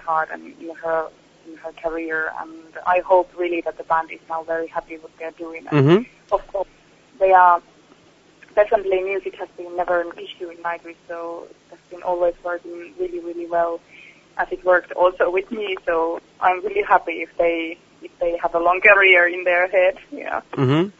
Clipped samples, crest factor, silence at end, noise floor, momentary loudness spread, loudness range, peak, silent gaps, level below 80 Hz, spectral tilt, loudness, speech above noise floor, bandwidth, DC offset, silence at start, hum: under 0.1%; 20 dB; 0.1 s; -52 dBFS; 19 LU; 10 LU; -2 dBFS; none; -54 dBFS; -7 dB/octave; -20 LUFS; 32 dB; 7.8 kHz; under 0.1%; 0.05 s; none